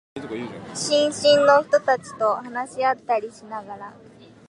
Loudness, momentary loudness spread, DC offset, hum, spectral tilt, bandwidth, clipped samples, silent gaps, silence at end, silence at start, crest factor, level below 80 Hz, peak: -21 LUFS; 18 LU; under 0.1%; none; -3 dB/octave; 11.5 kHz; under 0.1%; none; 0.55 s; 0.15 s; 20 dB; -64 dBFS; -4 dBFS